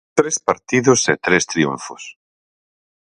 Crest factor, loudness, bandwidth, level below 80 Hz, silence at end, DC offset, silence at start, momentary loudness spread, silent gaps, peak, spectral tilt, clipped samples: 20 dB; -17 LUFS; 11 kHz; -56 dBFS; 1.05 s; under 0.1%; 0.15 s; 17 LU; none; 0 dBFS; -3.5 dB/octave; under 0.1%